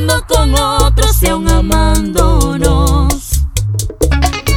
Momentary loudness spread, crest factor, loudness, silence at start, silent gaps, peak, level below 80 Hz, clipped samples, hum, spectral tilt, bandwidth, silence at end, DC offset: 5 LU; 10 dB; -12 LUFS; 0 s; none; 0 dBFS; -14 dBFS; under 0.1%; none; -4.5 dB/octave; 17.5 kHz; 0 s; under 0.1%